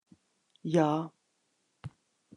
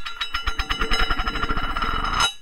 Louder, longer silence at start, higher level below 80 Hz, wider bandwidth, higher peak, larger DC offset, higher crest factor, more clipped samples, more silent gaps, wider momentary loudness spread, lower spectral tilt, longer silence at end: second, -30 LUFS vs -24 LUFS; first, 0.65 s vs 0 s; second, -76 dBFS vs -28 dBFS; second, 10.5 kHz vs 16 kHz; second, -12 dBFS vs -6 dBFS; neither; first, 22 dB vs 16 dB; neither; neither; first, 22 LU vs 5 LU; first, -7.5 dB/octave vs -2.5 dB/octave; first, 0.5 s vs 0 s